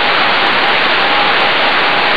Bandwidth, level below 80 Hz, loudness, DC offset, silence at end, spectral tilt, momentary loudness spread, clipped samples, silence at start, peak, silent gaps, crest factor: 11 kHz; -54 dBFS; -10 LUFS; 7%; 0 s; -3.5 dB/octave; 0 LU; under 0.1%; 0 s; 0 dBFS; none; 12 dB